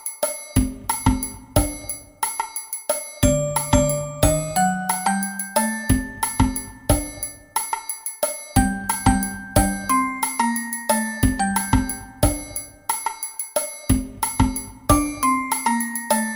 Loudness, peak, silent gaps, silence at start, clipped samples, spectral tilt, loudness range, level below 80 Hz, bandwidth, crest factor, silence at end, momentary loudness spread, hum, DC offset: -22 LUFS; -2 dBFS; none; 0 s; under 0.1%; -4.5 dB/octave; 2 LU; -32 dBFS; 17 kHz; 20 dB; 0 s; 7 LU; none; under 0.1%